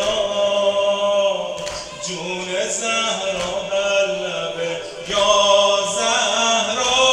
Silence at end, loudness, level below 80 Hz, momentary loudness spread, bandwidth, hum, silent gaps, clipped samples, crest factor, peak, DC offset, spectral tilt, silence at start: 0 s; -19 LUFS; -52 dBFS; 11 LU; 11.5 kHz; none; none; under 0.1%; 16 dB; -2 dBFS; under 0.1%; -1 dB/octave; 0 s